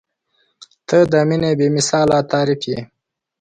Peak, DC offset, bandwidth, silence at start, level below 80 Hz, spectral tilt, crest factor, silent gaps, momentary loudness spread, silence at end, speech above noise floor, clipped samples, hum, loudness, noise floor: -2 dBFS; under 0.1%; 9.6 kHz; 0.9 s; -52 dBFS; -5 dB/octave; 16 dB; none; 10 LU; 0.55 s; 49 dB; under 0.1%; none; -16 LUFS; -65 dBFS